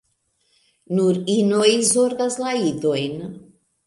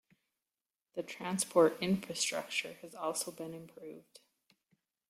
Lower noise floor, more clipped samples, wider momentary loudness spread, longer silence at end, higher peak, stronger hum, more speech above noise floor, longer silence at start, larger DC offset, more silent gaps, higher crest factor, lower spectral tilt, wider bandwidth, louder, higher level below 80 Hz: second, -68 dBFS vs under -90 dBFS; neither; second, 10 LU vs 21 LU; second, 0.45 s vs 1.1 s; first, -4 dBFS vs -14 dBFS; neither; second, 49 dB vs over 55 dB; about the same, 0.9 s vs 0.95 s; neither; neither; about the same, 18 dB vs 22 dB; about the same, -4 dB/octave vs -3.5 dB/octave; second, 11.5 kHz vs 16 kHz; first, -19 LUFS vs -34 LUFS; first, -66 dBFS vs -78 dBFS